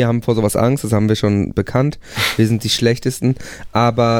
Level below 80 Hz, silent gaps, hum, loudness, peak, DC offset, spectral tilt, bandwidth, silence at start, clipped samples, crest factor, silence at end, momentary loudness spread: -42 dBFS; none; none; -17 LUFS; -2 dBFS; under 0.1%; -5.5 dB/octave; 17 kHz; 0 s; under 0.1%; 14 dB; 0 s; 5 LU